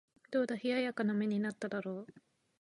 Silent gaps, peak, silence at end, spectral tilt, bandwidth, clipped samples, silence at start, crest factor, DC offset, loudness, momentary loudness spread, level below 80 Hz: none; -22 dBFS; 0.45 s; -6.5 dB/octave; 11 kHz; under 0.1%; 0.3 s; 14 dB; under 0.1%; -36 LUFS; 10 LU; -84 dBFS